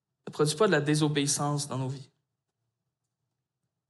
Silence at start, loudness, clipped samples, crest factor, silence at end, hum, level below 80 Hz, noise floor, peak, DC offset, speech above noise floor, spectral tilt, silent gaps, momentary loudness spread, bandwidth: 0.25 s; -27 LUFS; under 0.1%; 18 dB; 1.85 s; none; -74 dBFS; -85 dBFS; -12 dBFS; under 0.1%; 58 dB; -4.5 dB/octave; none; 13 LU; 12.5 kHz